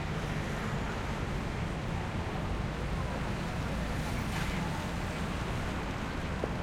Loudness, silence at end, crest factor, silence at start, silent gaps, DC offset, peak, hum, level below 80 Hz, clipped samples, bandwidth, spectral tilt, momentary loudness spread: -35 LUFS; 0 s; 18 dB; 0 s; none; under 0.1%; -16 dBFS; none; -40 dBFS; under 0.1%; 16 kHz; -6 dB/octave; 2 LU